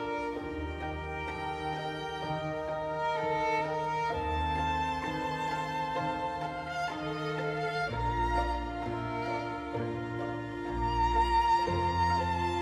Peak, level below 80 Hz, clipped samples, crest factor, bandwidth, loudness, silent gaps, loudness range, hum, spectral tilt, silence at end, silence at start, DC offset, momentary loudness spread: -16 dBFS; -44 dBFS; under 0.1%; 16 dB; 12.5 kHz; -32 LUFS; none; 3 LU; none; -6 dB/octave; 0 s; 0 s; under 0.1%; 8 LU